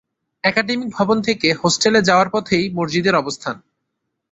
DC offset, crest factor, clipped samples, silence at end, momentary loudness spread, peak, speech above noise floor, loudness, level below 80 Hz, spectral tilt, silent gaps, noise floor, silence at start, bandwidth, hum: under 0.1%; 18 dB; under 0.1%; 0.75 s; 10 LU; 0 dBFS; 58 dB; -17 LUFS; -56 dBFS; -4 dB/octave; none; -76 dBFS; 0.45 s; 8.4 kHz; none